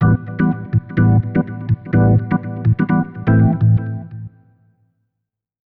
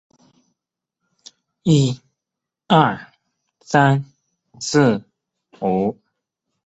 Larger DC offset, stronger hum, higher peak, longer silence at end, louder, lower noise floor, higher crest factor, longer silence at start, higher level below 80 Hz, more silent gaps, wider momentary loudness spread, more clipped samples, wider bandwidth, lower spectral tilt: neither; neither; second, -6 dBFS vs -2 dBFS; first, 1.45 s vs 0.75 s; about the same, -17 LUFS vs -19 LUFS; second, -79 dBFS vs -84 dBFS; second, 10 dB vs 20 dB; second, 0 s vs 1.65 s; first, -36 dBFS vs -56 dBFS; neither; about the same, 12 LU vs 13 LU; neither; second, 3.2 kHz vs 8.2 kHz; first, -12.5 dB/octave vs -6 dB/octave